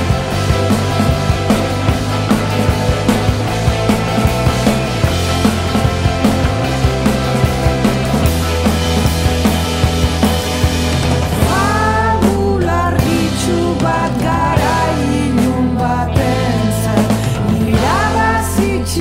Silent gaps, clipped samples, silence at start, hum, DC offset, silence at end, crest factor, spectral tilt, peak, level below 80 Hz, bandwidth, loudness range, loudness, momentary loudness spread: none; under 0.1%; 0 s; none; under 0.1%; 0 s; 12 dB; -5.5 dB/octave; 0 dBFS; -24 dBFS; 16.5 kHz; 1 LU; -14 LUFS; 2 LU